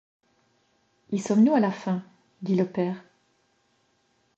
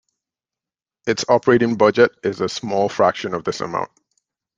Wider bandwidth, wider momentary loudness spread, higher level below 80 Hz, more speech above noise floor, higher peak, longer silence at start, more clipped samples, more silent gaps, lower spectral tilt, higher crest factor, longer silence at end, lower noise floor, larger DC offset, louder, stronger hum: second, 8.2 kHz vs 9.4 kHz; about the same, 12 LU vs 11 LU; second, -76 dBFS vs -60 dBFS; second, 45 dB vs 72 dB; second, -10 dBFS vs 0 dBFS; about the same, 1.1 s vs 1.05 s; neither; neither; first, -7.5 dB/octave vs -5 dB/octave; about the same, 18 dB vs 20 dB; first, 1.35 s vs 0.7 s; second, -69 dBFS vs -90 dBFS; neither; second, -25 LUFS vs -19 LUFS; neither